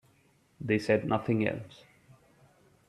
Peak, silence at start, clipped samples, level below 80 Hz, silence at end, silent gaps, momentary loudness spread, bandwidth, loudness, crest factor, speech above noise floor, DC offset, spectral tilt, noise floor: -12 dBFS; 0.6 s; under 0.1%; -66 dBFS; 1.15 s; none; 15 LU; 12.5 kHz; -30 LUFS; 22 dB; 37 dB; under 0.1%; -7.5 dB/octave; -66 dBFS